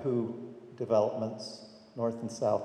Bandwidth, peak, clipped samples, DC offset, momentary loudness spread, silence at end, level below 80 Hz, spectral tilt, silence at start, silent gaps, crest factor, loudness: 10 kHz; -14 dBFS; under 0.1%; under 0.1%; 18 LU; 0 s; -78 dBFS; -6.5 dB/octave; 0 s; none; 18 dB; -33 LUFS